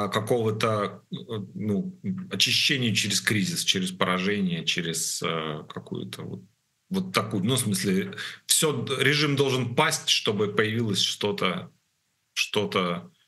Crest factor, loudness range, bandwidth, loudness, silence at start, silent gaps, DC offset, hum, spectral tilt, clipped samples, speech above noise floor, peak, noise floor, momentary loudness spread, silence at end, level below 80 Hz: 24 dB; 5 LU; 13 kHz; -25 LUFS; 0 s; none; under 0.1%; none; -3.5 dB/octave; under 0.1%; 47 dB; -4 dBFS; -73 dBFS; 14 LU; 0.2 s; -68 dBFS